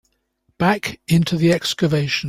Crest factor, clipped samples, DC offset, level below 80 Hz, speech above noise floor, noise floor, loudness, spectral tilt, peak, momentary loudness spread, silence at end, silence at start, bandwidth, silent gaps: 16 dB; under 0.1%; under 0.1%; -50 dBFS; 48 dB; -67 dBFS; -19 LUFS; -5.5 dB/octave; -4 dBFS; 3 LU; 0 s; 0.6 s; 15.5 kHz; none